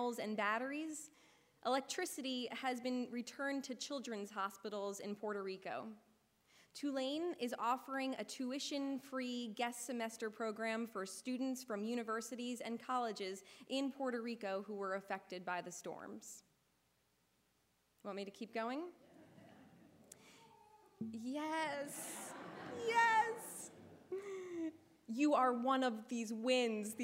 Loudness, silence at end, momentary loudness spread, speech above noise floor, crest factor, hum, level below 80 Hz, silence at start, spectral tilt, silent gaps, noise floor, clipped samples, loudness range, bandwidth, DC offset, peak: -41 LUFS; 0 s; 14 LU; 38 dB; 20 dB; none; under -90 dBFS; 0 s; -3 dB/octave; none; -79 dBFS; under 0.1%; 11 LU; 16 kHz; under 0.1%; -22 dBFS